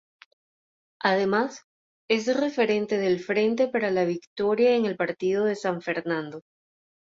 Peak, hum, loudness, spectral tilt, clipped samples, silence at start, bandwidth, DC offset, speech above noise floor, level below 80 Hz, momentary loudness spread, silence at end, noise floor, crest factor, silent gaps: -8 dBFS; none; -25 LUFS; -5.5 dB/octave; under 0.1%; 1.05 s; 7.8 kHz; under 0.1%; over 66 dB; -70 dBFS; 7 LU; 0.8 s; under -90 dBFS; 18 dB; 1.64-2.08 s, 4.27-4.36 s